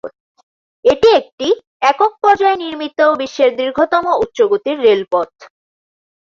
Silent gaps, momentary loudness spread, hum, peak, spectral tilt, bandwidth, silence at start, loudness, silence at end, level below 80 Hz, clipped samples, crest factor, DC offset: 0.20-0.35 s, 0.43-0.83 s, 1.33-1.38 s, 1.67-1.80 s; 7 LU; none; 0 dBFS; -4 dB/octave; 7.4 kHz; 0.05 s; -14 LUFS; 0.75 s; -52 dBFS; under 0.1%; 14 dB; under 0.1%